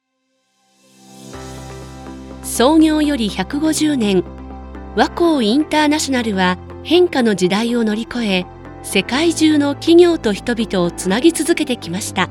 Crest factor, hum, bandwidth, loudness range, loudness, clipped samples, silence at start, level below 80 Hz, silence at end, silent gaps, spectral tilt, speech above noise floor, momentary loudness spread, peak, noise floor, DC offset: 16 dB; none; 16.5 kHz; 3 LU; -16 LUFS; under 0.1%; 1.2 s; -40 dBFS; 0 s; none; -4.5 dB/octave; 52 dB; 20 LU; 0 dBFS; -67 dBFS; under 0.1%